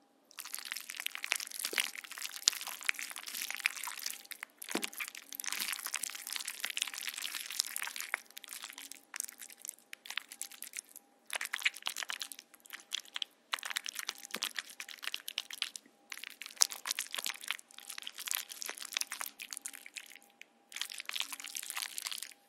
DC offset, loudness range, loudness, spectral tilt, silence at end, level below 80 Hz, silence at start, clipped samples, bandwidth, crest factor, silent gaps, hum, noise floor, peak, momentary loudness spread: under 0.1%; 5 LU; -38 LUFS; 2.5 dB/octave; 0.15 s; under -90 dBFS; 0.35 s; under 0.1%; 16.5 kHz; 42 dB; none; none; -61 dBFS; 0 dBFS; 12 LU